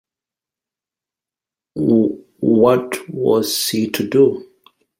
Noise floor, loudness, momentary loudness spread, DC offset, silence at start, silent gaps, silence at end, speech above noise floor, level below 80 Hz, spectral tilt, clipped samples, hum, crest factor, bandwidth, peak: -89 dBFS; -17 LUFS; 9 LU; under 0.1%; 1.75 s; none; 0.55 s; 73 dB; -60 dBFS; -5 dB/octave; under 0.1%; none; 18 dB; 16.5 kHz; -2 dBFS